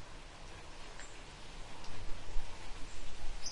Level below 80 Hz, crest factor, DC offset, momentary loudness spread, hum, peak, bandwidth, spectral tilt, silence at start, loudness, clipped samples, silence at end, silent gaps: -46 dBFS; 16 dB; under 0.1%; 4 LU; none; -18 dBFS; 11 kHz; -3 dB/octave; 0 s; -50 LUFS; under 0.1%; 0 s; none